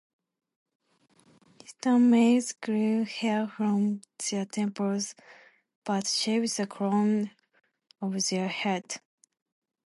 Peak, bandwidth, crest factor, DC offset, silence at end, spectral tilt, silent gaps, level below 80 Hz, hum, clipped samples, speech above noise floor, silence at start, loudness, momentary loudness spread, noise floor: -12 dBFS; 11.5 kHz; 16 dB; under 0.1%; 0.9 s; -4.5 dB/octave; 5.75-5.82 s; -80 dBFS; none; under 0.1%; 38 dB; 1.7 s; -28 LUFS; 11 LU; -65 dBFS